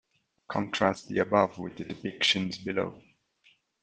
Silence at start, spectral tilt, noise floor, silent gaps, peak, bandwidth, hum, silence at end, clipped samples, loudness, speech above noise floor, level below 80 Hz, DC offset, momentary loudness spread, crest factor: 0.5 s; -4.5 dB/octave; -66 dBFS; none; -8 dBFS; 9.6 kHz; none; 0.85 s; under 0.1%; -29 LUFS; 37 dB; -66 dBFS; under 0.1%; 12 LU; 22 dB